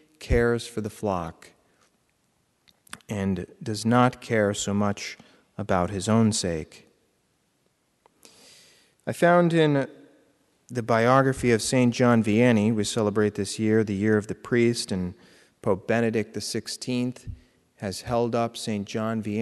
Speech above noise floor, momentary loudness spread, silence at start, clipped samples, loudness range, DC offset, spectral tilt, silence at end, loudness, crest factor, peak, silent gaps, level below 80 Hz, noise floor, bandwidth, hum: 46 dB; 15 LU; 0.2 s; under 0.1%; 7 LU; under 0.1%; -5.5 dB/octave; 0 s; -24 LUFS; 20 dB; -6 dBFS; none; -46 dBFS; -70 dBFS; 12 kHz; none